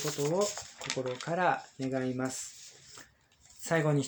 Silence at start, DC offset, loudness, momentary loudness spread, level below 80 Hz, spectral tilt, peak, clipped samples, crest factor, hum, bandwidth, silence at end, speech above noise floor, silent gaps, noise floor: 0 s; under 0.1%; -33 LUFS; 19 LU; -72 dBFS; -4.5 dB/octave; -14 dBFS; under 0.1%; 20 dB; none; over 20 kHz; 0 s; 30 dB; none; -62 dBFS